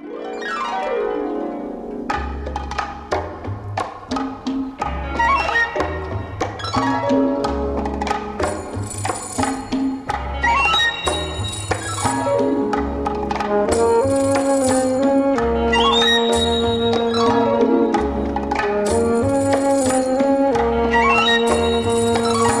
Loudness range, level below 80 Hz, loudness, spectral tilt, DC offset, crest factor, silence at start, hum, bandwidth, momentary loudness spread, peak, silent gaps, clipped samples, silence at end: 8 LU; -34 dBFS; -19 LUFS; -4.5 dB/octave; under 0.1%; 16 dB; 0 s; none; 13.5 kHz; 11 LU; -4 dBFS; none; under 0.1%; 0 s